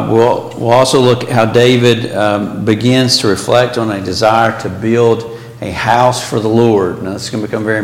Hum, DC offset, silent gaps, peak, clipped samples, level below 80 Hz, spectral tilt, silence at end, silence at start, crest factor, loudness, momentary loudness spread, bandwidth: none; under 0.1%; none; 0 dBFS; under 0.1%; -46 dBFS; -5 dB/octave; 0 s; 0 s; 12 dB; -12 LUFS; 9 LU; 16.5 kHz